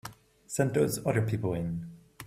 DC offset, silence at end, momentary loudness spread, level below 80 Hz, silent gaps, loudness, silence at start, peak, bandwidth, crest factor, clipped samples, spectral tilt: under 0.1%; 0 s; 15 LU; -58 dBFS; none; -30 LUFS; 0.05 s; -12 dBFS; 15.5 kHz; 20 dB; under 0.1%; -6 dB/octave